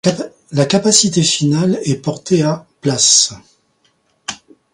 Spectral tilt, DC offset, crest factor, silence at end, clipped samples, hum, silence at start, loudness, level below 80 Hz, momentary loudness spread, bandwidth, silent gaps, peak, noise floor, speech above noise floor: -3.5 dB/octave; under 0.1%; 16 dB; 0.4 s; under 0.1%; none; 0.05 s; -13 LUFS; -54 dBFS; 17 LU; 16 kHz; none; 0 dBFS; -60 dBFS; 46 dB